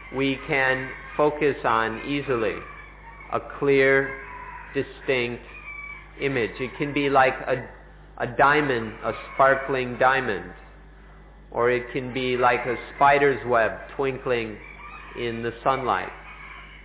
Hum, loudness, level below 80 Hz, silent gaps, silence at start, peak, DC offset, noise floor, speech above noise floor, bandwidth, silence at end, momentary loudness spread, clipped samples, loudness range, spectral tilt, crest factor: none; -24 LUFS; -48 dBFS; none; 0 s; -6 dBFS; under 0.1%; -47 dBFS; 23 dB; 4 kHz; 0 s; 18 LU; under 0.1%; 3 LU; -9 dB/octave; 18 dB